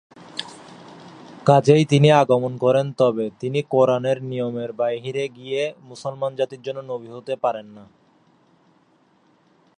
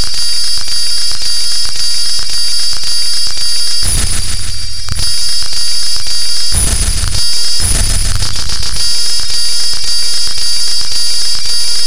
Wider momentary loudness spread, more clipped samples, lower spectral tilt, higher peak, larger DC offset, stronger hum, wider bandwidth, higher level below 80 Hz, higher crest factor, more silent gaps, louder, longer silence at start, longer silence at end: first, 18 LU vs 3 LU; second, under 0.1% vs 0.3%; first, -6.5 dB/octave vs -0.5 dB/octave; about the same, -2 dBFS vs 0 dBFS; second, under 0.1% vs 50%; neither; second, 10 kHz vs 16.5 kHz; second, -66 dBFS vs -22 dBFS; about the same, 20 dB vs 16 dB; neither; second, -21 LUFS vs -12 LUFS; first, 0.2 s vs 0 s; first, 1.95 s vs 0 s